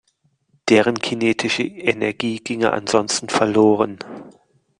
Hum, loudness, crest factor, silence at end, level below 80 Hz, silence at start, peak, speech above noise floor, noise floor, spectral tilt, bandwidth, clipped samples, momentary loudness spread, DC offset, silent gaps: none; -19 LUFS; 18 dB; 0.5 s; -60 dBFS; 0.65 s; -2 dBFS; 47 dB; -65 dBFS; -4 dB/octave; 10.5 kHz; under 0.1%; 10 LU; under 0.1%; none